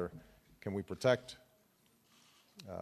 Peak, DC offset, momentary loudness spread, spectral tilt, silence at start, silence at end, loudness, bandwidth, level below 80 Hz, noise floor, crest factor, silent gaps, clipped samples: -16 dBFS; under 0.1%; 24 LU; -5.5 dB/octave; 0 s; 0 s; -37 LUFS; 13.5 kHz; -72 dBFS; -71 dBFS; 26 dB; none; under 0.1%